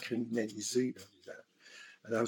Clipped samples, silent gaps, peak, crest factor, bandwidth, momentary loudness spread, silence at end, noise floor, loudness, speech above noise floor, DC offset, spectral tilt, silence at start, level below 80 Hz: under 0.1%; none; -20 dBFS; 18 dB; 17.5 kHz; 19 LU; 0 s; -57 dBFS; -36 LUFS; 20 dB; under 0.1%; -4 dB/octave; 0 s; under -90 dBFS